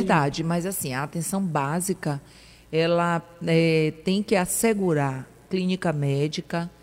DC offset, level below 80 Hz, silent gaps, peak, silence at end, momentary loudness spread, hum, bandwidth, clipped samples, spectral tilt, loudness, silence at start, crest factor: under 0.1%; -56 dBFS; none; -8 dBFS; 0.15 s; 7 LU; none; 16 kHz; under 0.1%; -5.5 dB/octave; -25 LUFS; 0 s; 18 dB